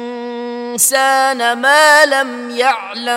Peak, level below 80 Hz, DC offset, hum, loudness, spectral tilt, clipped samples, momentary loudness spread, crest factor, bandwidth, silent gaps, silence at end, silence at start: 0 dBFS; -70 dBFS; under 0.1%; none; -12 LUFS; 0 dB/octave; under 0.1%; 16 LU; 14 dB; 17.5 kHz; none; 0 s; 0 s